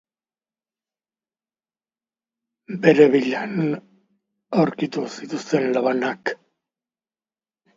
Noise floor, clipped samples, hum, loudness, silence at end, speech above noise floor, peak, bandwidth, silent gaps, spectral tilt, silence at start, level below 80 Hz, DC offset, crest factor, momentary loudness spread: under -90 dBFS; under 0.1%; none; -21 LUFS; 1.45 s; over 70 dB; -2 dBFS; 7.6 kHz; none; -6.5 dB/octave; 2.7 s; -72 dBFS; under 0.1%; 22 dB; 15 LU